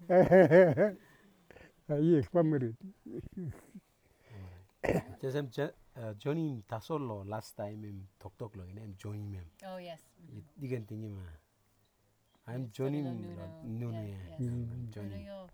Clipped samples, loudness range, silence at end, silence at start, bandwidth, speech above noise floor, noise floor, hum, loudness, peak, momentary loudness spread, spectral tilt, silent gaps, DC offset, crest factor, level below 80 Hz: under 0.1%; 13 LU; 0.05 s; 0 s; 19 kHz; 40 dB; -73 dBFS; none; -32 LUFS; -10 dBFS; 22 LU; -8.5 dB/octave; none; under 0.1%; 22 dB; -62 dBFS